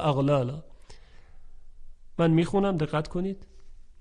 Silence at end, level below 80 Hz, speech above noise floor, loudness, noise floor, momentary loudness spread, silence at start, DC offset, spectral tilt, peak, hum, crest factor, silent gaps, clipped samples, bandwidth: 0.1 s; -46 dBFS; 22 dB; -26 LUFS; -47 dBFS; 16 LU; 0 s; under 0.1%; -8 dB/octave; -12 dBFS; none; 16 dB; none; under 0.1%; 10 kHz